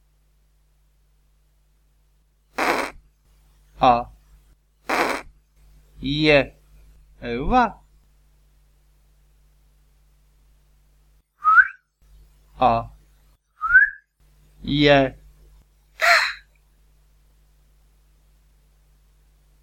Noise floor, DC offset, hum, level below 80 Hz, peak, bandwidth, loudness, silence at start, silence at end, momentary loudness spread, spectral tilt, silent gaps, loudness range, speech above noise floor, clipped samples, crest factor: -61 dBFS; under 0.1%; none; -44 dBFS; -2 dBFS; 17.5 kHz; -19 LUFS; 2.6 s; 3.25 s; 18 LU; -4.5 dB/octave; none; 8 LU; 43 dB; under 0.1%; 24 dB